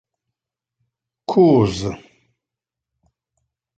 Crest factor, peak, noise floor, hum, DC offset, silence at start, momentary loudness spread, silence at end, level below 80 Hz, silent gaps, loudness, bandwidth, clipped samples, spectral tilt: 20 dB; -4 dBFS; -86 dBFS; none; under 0.1%; 1.3 s; 20 LU; 1.8 s; -48 dBFS; none; -17 LUFS; 8.8 kHz; under 0.1%; -7.5 dB/octave